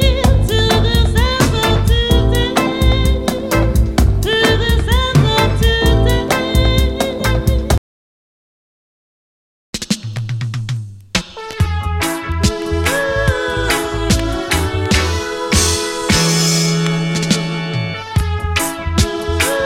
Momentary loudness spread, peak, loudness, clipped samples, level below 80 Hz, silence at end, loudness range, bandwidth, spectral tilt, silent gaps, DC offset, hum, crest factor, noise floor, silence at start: 8 LU; 0 dBFS; -15 LUFS; under 0.1%; -20 dBFS; 0 s; 8 LU; 17 kHz; -4.5 dB/octave; 7.78-9.73 s; under 0.1%; none; 14 dB; under -90 dBFS; 0 s